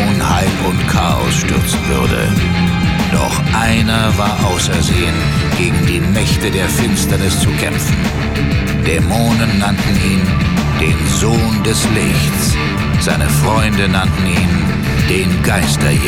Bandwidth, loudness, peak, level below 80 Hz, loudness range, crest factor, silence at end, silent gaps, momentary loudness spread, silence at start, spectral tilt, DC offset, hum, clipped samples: 17 kHz; -13 LUFS; 0 dBFS; -24 dBFS; 1 LU; 12 dB; 0 s; none; 2 LU; 0 s; -5 dB/octave; under 0.1%; none; under 0.1%